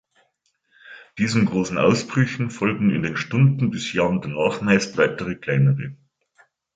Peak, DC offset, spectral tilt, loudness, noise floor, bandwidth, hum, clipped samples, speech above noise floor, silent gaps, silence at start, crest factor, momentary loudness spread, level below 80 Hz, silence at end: -4 dBFS; under 0.1%; -6.5 dB/octave; -21 LUFS; -69 dBFS; 9 kHz; none; under 0.1%; 49 dB; none; 0.85 s; 18 dB; 6 LU; -54 dBFS; 0.8 s